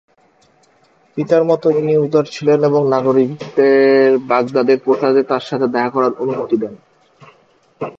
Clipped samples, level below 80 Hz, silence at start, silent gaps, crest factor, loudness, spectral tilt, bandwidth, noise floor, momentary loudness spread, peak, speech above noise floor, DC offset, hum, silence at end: under 0.1%; -64 dBFS; 1.15 s; none; 16 dB; -15 LUFS; -7.5 dB/octave; 7.4 kHz; -54 dBFS; 8 LU; 0 dBFS; 40 dB; under 0.1%; none; 0.05 s